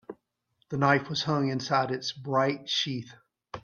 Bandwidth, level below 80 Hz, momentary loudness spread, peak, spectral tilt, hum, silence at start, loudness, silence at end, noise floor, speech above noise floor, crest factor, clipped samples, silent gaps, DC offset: 7.2 kHz; -66 dBFS; 15 LU; -8 dBFS; -5 dB/octave; none; 0.1 s; -28 LUFS; 0.05 s; -74 dBFS; 46 dB; 22 dB; under 0.1%; none; under 0.1%